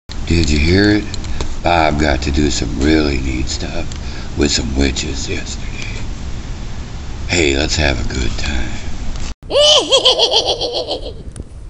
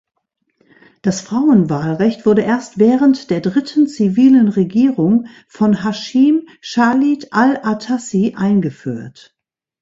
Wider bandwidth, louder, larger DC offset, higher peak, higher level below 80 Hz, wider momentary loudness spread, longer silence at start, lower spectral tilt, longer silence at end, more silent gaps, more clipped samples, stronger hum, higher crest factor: first, 10.5 kHz vs 7.8 kHz; about the same, -15 LUFS vs -15 LUFS; neither; about the same, 0 dBFS vs 0 dBFS; first, -22 dBFS vs -56 dBFS; first, 18 LU vs 9 LU; second, 0.1 s vs 1.05 s; second, -4 dB/octave vs -6.5 dB/octave; second, 0 s vs 0.7 s; first, 9.34-9.42 s vs none; neither; neither; about the same, 16 dB vs 14 dB